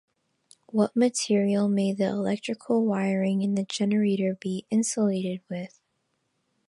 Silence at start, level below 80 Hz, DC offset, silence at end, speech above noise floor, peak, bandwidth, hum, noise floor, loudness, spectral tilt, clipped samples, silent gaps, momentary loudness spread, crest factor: 0.75 s; -74 dBFS; under 0.1%; 1 s; 50 dB; -10 dBFS; 11.5 kHz; none; -75 dBFS; -26 LUFS; -5.5 dB/octave; under 0.1%; none; 9 LU; 18 dB